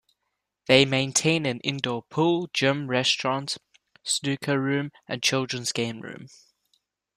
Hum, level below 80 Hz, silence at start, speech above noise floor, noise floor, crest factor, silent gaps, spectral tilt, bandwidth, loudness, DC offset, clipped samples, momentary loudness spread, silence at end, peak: none; -64 dBFS; 0.7 s; 55 dB; -80 dBFS; 22 dB; none; -3.5 dB/octave; 14.5 kHz; -24 LUFS; under 0.1%; under 0.1%; 13 LU; 0.9 s; -4 dBFS